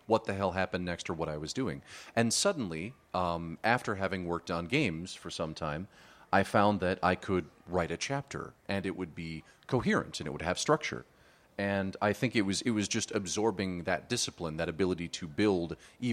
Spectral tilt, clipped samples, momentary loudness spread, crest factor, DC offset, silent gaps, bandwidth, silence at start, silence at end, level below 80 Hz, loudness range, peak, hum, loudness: -4.5 dB/octave; under 0.1%; 10 LU; 24 dB; under 0.1%; none; 15.5 kHz; 0.1 s; 0 s; -58 dBFS; 2 LU; -10 dBFS; none; -32 LUFS